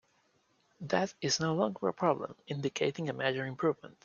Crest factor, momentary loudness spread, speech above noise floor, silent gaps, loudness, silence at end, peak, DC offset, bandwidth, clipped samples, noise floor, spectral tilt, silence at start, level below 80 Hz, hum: 20 dB; 6 LU; 39 dB; none; -33 LUFS; 0.15 s; -14 dBFS; under 0.1%; 7.4 kHz; under 0.1%; -72 dBFS; -4.5 dB/octave; 0.8 s; -74 dBFS; none